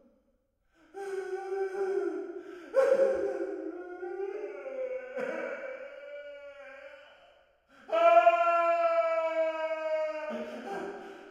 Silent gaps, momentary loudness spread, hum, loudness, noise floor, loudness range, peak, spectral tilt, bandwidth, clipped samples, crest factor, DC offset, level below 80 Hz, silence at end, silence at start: none; 20 LU; none; -30 LUFS; -73 dBFS; 12 LU; -10 dBFS; -4 dB/octave; 9.6 kHz; under 0.1%; 22 dB; under 0.1%; -76 dBFS; 0 s; 0.95 s